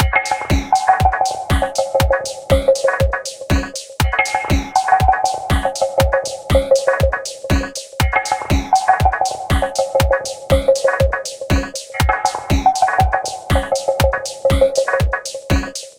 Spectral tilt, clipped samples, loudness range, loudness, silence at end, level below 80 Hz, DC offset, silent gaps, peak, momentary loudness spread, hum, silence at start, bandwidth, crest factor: -4.5 dB/octave; under 0.1%; 1 LU; -17 LUFS; 0.1 s; -24 dBFS; under 0.1%; none; 0 dBFS; 6 LU; none; 0 s; 17 kHz; 16 dB